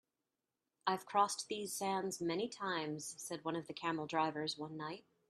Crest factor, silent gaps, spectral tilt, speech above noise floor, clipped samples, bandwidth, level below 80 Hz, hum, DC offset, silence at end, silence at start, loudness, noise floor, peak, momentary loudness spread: 22 dB; none; -3.5 dB/octave; over 50 dB; under 0.1%; 14 kHz; -84 dBFS; none; under 0.1%; 0.3 s; 0.85 s; -40 LUFS; under -90 dBFS; -18 dBFS; 9 LU